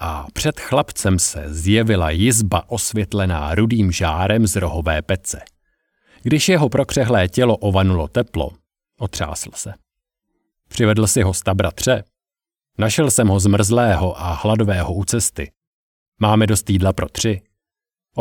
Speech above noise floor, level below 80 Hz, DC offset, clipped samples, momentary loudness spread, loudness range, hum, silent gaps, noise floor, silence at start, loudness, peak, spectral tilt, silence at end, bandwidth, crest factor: over 73 dB; -34 dBFS; under 0.1%; under 0.1%; 11 LU; 3 LU; none; 15.57-15.61 s, 15.67-16.12 s; under -90 dBFS; 0 s; -18 LUFS; -2 dBFS; -5 dB/octave; 0 s; 18 kHz; 16 dB